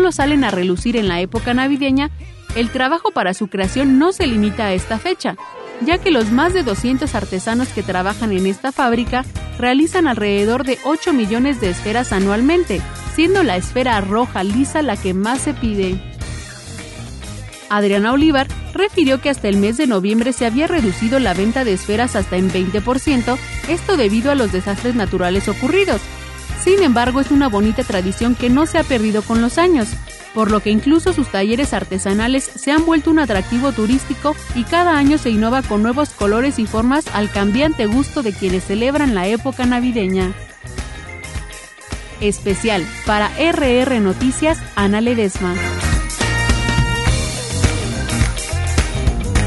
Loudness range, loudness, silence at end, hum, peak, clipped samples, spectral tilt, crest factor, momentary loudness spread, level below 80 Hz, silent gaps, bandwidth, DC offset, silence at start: 3 LU; -17 LUFS; 0 s; none; 0 dBFS; under 0.1%; -5 dB/octave; 16 dB; 8 LU; -30 dBFS; none; 12 kHz; under 0.1%; 0 s